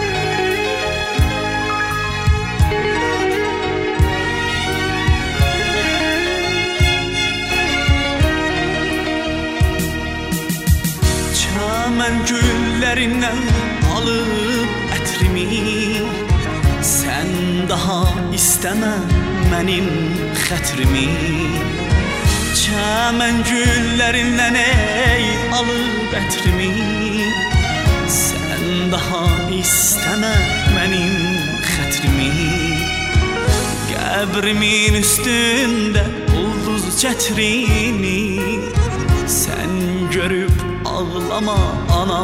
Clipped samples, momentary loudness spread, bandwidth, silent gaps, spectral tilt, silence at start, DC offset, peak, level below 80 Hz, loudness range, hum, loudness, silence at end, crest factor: under 0.1%; 5 LU; 16 kHz; none; -4 dB/octave; 0 s; under 0.1%; 0 dBFS; -24 dBFS; 3 LU; none; -17 LUFS; 0 s; 16 dB